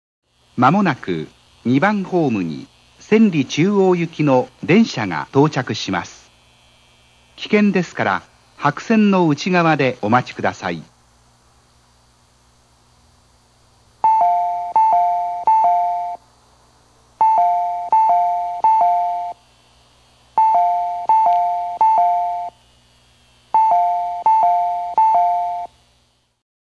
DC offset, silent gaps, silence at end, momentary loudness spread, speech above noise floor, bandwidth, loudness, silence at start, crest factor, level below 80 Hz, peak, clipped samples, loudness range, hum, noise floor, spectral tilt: under 0.1%; none; 1.05 s; 11 LU; 44 dB; 9.6 kHz; -17 LUFS; 0.55 s; 18 dB; -60 dBFS; 0 dBFS; under 0.1%; 4 LU; 60 Hz at -50 dBFS; -60 dBFS; -6.5 dB/octave